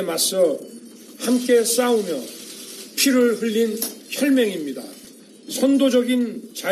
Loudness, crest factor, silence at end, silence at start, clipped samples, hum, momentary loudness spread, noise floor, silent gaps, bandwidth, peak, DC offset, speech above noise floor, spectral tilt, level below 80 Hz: -20 LUFS; 14 dB; 0 s; 0 s; under 0.1%; none; 17 LU; -44 dBFS; none; 14 kHz; -6 dBFS; under 0.1%; 25 dB; -3 dB/octave; -72 dBFS